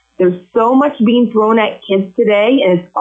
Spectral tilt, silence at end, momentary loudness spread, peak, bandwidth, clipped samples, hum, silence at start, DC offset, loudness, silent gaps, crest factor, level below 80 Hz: -8.5 dB/octave; 0 s; 5 LU; -2 dBFS; 7.4 kHz; under 0.1%; none; 0.2 s; under 0.1%; -12 LUFS; none; 8 dB; -60 dBFS